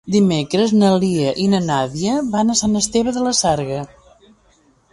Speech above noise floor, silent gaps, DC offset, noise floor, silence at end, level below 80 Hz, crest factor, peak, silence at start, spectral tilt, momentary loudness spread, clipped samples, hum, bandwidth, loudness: 39 dB; none; under 0.1%; -56 dBFS; 1.05 s; -48 dBFS; 14 dB; -4 dBFS; 0.05 s; -5 dB/octave; 6 LU; under 0.1%; none; 11.5 kHz; -17 LUFS